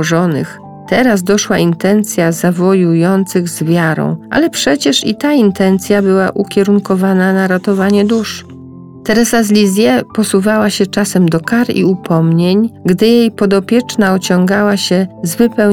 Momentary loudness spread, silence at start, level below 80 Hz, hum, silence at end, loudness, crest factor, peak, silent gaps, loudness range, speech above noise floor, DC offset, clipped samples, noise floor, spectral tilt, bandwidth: 4 LU; 0 s; -46 dBFS; none; 0 s; -12 LUFS; 10 dB; 0 dBFS; none; 1 LU; 21 dB; under 0.1%; under 0.1%; -32 dBFS; -5.5 dB/octave; 17.5 kHz